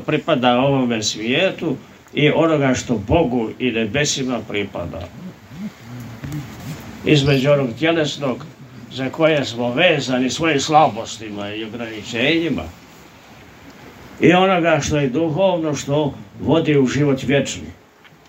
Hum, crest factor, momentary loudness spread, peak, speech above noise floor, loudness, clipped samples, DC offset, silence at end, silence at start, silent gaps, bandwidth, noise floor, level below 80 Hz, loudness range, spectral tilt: none; 18 dB; 17 LU; 0 dBFS; 30 dB; -18 LUFS; under 0.1%; under 0.1%; 0.55 s; 0 s; none; 16 kHz; -48 dBFS; -46 dBFS; 5 LU; -5 dB/octave